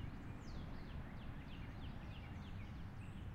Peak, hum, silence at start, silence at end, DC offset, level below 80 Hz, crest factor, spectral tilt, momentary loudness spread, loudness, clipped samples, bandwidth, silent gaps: -38 dBFS; none; 0 s; 0 s; under 0.1%; -54 dBFS; 12 dB; -7 dB/octave; 1 LU; -52 LUFS; under 0.1%; 16 kHz; none